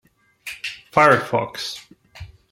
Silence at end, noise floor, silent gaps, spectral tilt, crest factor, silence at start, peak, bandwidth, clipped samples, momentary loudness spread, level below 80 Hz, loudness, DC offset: 0.25 s; -41 dBFS; none; -4.5 dB/octave; 22 dB; 0.45 s; -2 dBFS; 16.5 kHz; under 0.1%; 21 LU; -54 dBFS; -20 LUFS; under 0.1%